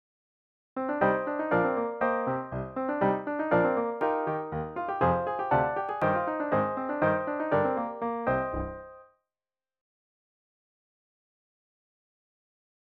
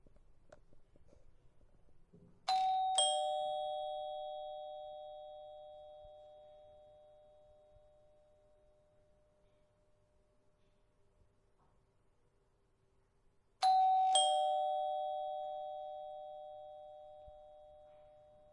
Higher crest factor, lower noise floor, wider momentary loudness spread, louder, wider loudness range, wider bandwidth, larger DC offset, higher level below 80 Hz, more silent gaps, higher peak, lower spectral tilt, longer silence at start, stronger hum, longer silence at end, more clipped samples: second, 18 dB vs 24 dB; first, under -90 dBFS vs -75 dBFS; second, 7 LU vs 26 LU; first, -29 LUFS vs -36 LUFS; second, 8 LU vs 17 LU; second, 5.4 kHz vs 10.5 kHz; neither; first, -54 dBFS vs -72 dBFS; neither; first, -12 dBFS vs -18 dBFS; first, -9.5 dB/octave vs 0.5 dB/octave; first, 0.75 s vs 0.05 s; neither; first, 3.95 s vs 0.5 s; neither